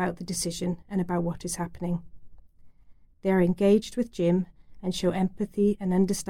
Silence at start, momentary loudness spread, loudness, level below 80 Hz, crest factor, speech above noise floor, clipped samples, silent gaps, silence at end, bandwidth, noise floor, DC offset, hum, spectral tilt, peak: 0 s; 10 LU; -27 LUFS; -50 dBFS; 16 dB; 27 dB; under 0.1%; none; 0 s; 16 kHz; -53 dBFS; under 0.1%; none; -6 dB/octave; -10 dBFS